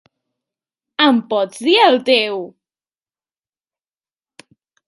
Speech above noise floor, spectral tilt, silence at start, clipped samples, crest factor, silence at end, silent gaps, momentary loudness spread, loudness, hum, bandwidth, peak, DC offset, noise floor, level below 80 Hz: over 75 dB; -3.5 dB/octave; 1 s; under 0.1%; 18 dB; 2.4 s; none; 16 LU; -14 LUFS; none; 11.5 kHz; 0 dBFS; under 0.1%; under -90 dBFS; -74 dBFS